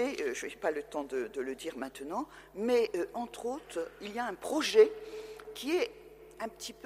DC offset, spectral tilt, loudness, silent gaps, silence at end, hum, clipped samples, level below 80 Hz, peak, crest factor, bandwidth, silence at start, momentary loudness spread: under 0.1%; -3 dB/octave; -33 LUFS; none; 0 s; none; under 0.1%; -66 dBFS; -12 dBFS; 22 dB; 15.5 kHz; 0 s; 16 LU